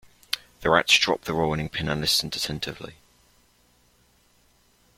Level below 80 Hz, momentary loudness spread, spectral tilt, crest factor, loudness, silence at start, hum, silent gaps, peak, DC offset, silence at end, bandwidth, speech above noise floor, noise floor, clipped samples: -50 dBFS; 14 LU; -3 dB/octave; 26 dB; -23 LUFS; 0.35 s; 60 Hz at -60 dBFS; none; -2 dBFS; under 0.1%; 2.05 s; 16.5 kHz; 38 dB; -62 dBFS; under 0.1%